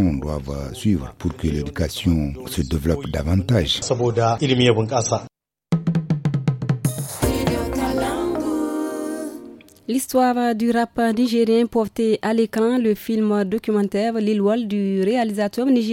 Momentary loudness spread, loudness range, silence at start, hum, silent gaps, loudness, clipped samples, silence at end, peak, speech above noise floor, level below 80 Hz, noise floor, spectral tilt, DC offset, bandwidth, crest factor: 7 LU; 4 LU; 0 s; none; none; -21 LUFS; under 0.1%; 0 s; -2 dBFS; 22 dB; -38 dBFS; -42 dBFS; -6 dB/octave; under 0.1%; 17 kHz; 18 dB